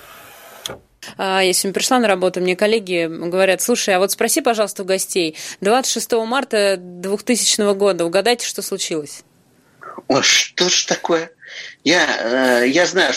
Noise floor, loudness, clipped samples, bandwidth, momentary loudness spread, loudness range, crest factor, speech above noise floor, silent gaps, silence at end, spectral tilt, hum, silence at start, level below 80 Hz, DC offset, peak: -55 dBFS; -17 LUFS; under 0.1%; 16 kHz; 16 LU; 2 LU; 18 dB; 37 dB; none; 0 s; -2 dB/octave; none; 0.05 s; -64 dBFS; under 0.1%; 0 dBFS